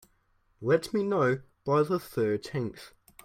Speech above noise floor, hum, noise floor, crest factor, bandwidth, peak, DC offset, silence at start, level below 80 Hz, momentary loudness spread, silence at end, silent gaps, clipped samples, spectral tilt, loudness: 41 dB; none; -69 dBFS; 18 dB; 16 kHz; -12 dBFS; under 0.1%; 0.6 s; -64 dBFS; 10 LU; 0.35 s; none; under 0.1%; -7 dB/octave; -29 LUFS